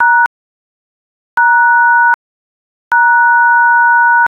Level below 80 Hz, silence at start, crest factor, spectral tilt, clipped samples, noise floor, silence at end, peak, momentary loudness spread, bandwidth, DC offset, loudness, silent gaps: -64 dBFS; 0 s; 10 dB; -1.5 dB/octave; under 0.1%; under -90 dBFS; 0.15 s; -2 dBFS; 7 LU; 4.3 kHz; under 0.1%; -9 LUFS; 0.26-1.37 s, 2.14-2.91 s